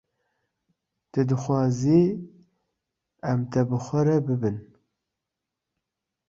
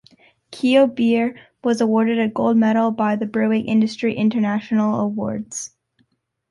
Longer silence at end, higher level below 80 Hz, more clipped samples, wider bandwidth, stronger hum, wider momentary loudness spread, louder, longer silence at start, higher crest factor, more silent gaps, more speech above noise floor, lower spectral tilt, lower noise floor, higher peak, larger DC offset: first, 1.65 s vs 0.85 s; about the same, -60 dBFS vs -62 dBFS; neither; second, 7.6 kHz vs 11.5 kHz; neither; about the same, 11 LU vs 10 LU; second, -24 LUFS vs -19 LUFS; first, 1.15 s vs 0.5 s; about the same, 18 dB vs 16 dB; neither; first, 62 dB vs 48 dB; first, -8.5 dB/octave vs -5.5 dB/octave; first, -85 dBFS vs -66 dBFS; second, -8 dBFS vs -4 dBFS; neither